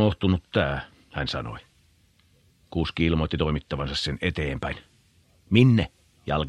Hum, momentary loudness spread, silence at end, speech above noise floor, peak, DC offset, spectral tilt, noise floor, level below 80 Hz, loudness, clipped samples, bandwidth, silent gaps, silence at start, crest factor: none; 15 LU; 0 s; 38 dB; -2 dBFS; under 0.1%; -7 dB/octave; -61 dBFS; -40 dBFS; -25 LUFS; under 0.1%; 10.5 kHz; none; 0 s; 24 dB